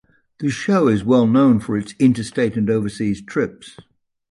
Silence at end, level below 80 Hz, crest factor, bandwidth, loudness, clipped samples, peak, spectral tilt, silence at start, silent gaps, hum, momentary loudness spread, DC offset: 0.6 s; -52 dBFS; 14 dB; 11.5 kHz; -18 LUFS; under 0.1%; -4 dBFS; -7 dB/octave; 0.4 s; none; none; 10 LU; under 0.1%